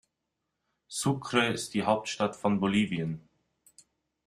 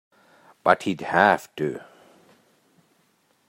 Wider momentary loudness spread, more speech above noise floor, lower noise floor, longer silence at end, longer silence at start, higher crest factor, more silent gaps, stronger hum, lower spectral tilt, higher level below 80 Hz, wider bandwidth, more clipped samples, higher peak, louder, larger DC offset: about the same, 9 LU vs 11 LU; first, 55 dB vs 44 dB; first, -83 dBFS vs -65 dBFS; second, 1.05 s vs 1.7 s; first, 0.9 s vs 0.65 s; about the same, 24 dB vs 24 dB; neither; neither; about the same, -4.5 dB/octave vs -5.5 dB/octave; first, -64 dBFS vs -70 dBFS; second, 13.5 kHz vs 16 kHz; neither; second, -8 dBFS vs -2 dBFS; second, -29 LUFS vs -22 LUFS; neither